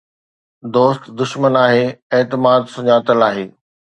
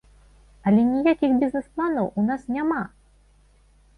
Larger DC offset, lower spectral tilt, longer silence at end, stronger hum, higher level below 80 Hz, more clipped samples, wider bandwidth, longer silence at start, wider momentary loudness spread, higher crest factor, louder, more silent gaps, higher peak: neither; second, -6.5 dB/octave vs -8.5 dB/octave; second, 0.5 s vs 1.1 s; second, none vs 50 Hz at -55 dBFS; second, -62 dBFS vs -54 dBFS; neither; about the same, 9 kHz vs 9.6 kHz; about the same, 0.65 s vs 0.65 s; about the same, 10 LU vs 8 LU; about the same, 16 dB vs 16 dB; first, -15 LUFS vs -23 LUFS; first, 2.02-2.10 s vs none; first, 0 dBFS vs -8 dBFS